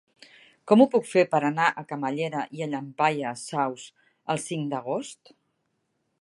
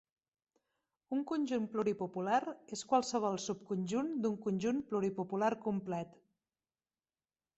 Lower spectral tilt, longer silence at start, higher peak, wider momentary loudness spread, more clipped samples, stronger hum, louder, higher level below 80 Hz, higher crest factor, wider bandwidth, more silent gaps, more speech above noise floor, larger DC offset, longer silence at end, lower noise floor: about the same, -5.5 dB/octave vs -5.5 dB/octave; second, 0.65 s vs 1.1 s; first, -4 dBFS vs -16 dBFS; first, 12 LU vs 6 LU; neither; neither; first, -25 LUFS vs -36 LUFS; about the same, -80 dBFS vs -78 dBFS; about the same, 22 dB vs 20 dB; first, 11.5 kHz vs 8.2 kHz; neither; second, 50 dB vs over 54 dB; neither; second, 1.1 s vs 1.5 s; second, -75 dBFS vs under -90 dBFS